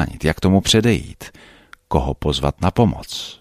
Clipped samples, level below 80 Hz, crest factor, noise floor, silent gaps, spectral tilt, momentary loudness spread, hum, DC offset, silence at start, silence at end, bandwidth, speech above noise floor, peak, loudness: under 0.1%; -32 dBFS; 18 dB; -46 dBFS; none; -5 dB/octave; 16 LU; none; under 0.1%; 0 s; 0.05 s; 15 kHz; 28 dB; -2 dBFS; -18 LUFS